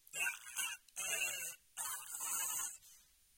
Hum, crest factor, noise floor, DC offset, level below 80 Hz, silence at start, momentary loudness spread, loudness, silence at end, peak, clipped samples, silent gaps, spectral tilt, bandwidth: none; 20 dB; -66 dBFS; under 0.1%; -82 dBFS; 0.15 s; 7 LU; -40 LUFS; 0.35 s; -24 dBFS; under 0.1%; none; 2.5 dB/octave; 17 kHz